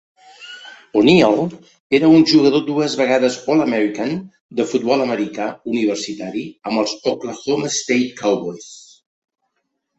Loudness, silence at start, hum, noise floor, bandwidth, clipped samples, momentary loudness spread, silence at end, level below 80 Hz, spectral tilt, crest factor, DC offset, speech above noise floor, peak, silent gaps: -17 LUFS; 0.4 s; none; -73 dBFS; 8.2 kHz; under 0.1%; 16 LU; 1.2 s; -58 dBFS; -5 dB/octave; 16 dB; under 0.1%; 56 dB; -2 dBFS; 1.80-1.90 s, 4.40-4.49 s